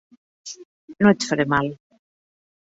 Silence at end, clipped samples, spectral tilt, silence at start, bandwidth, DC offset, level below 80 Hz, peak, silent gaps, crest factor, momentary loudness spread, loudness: 0.95 s; under 0.1%; -5.5 dB/octave; 0.45 s; 8 kHz; under 0.1%; -58 dBFS; -2 dBFS; 0.65-0.88 s; 22 dB; 22 LU; -20 LUFS